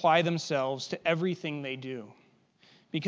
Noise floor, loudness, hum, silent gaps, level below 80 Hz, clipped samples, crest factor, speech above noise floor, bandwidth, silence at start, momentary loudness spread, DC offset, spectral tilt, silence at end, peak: -63 dBFS; -31 LUFS; none; none; -82 dBFS; under 0.1%; 22 dB; 34 dB; 8 kHz; 0 s; 14 LU; under 0.1%; -5.5 dB/octave; 0 s; -10 dBFS